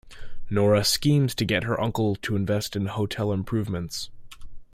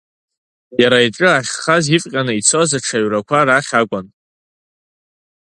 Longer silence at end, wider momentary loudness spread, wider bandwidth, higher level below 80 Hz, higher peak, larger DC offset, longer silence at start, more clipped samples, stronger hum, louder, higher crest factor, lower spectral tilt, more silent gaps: second, 0.1 s vs 1.5 s; first, 10 LU vs 6 LU; first, 16.5 kHz vs 11.5 kHz; first, -46 dBFS vs -58 dBFS; second, -8 dBFS vs 0 dBFS; neither; second, 0.05 s vs 0.7 s; neither; neither; second, -25 LUFS vs -14 LUFS; about the same, 16 dB vs 16 dB; first, -5 dB/octave vs -3.5 dB/octave; neither